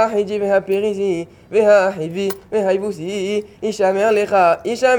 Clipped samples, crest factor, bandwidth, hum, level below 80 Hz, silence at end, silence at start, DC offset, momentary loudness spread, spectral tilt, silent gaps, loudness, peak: under 0.1%; 14 dB; over 20 kHz; none; -56 dBFS; 0 s; 0 s; under 0.1%; 10 LU; -5 dB/octave; none; -18 LUFS; -2 dBFS